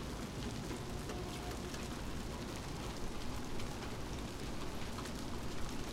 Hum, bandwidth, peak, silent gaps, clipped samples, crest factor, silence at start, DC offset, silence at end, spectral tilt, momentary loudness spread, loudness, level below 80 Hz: none; 16 kHz; -26 dBFS; none; under 0.1%; 14 dB; 0 s; under 0.1%; 0 s; -4.5 dB/octave; 1 LU; -44 LUFS; -48 dBFS